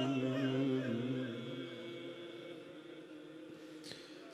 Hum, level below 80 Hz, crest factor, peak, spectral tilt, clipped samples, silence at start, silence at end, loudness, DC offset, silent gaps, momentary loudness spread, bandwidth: none; -86 dBFS; 16 dB; -24 dBFS; -6.5 dB/octave; under 0.1%; 0 s; 0 s; -40 LUFS; under 0.1%; none; 17 LU; 12 kHz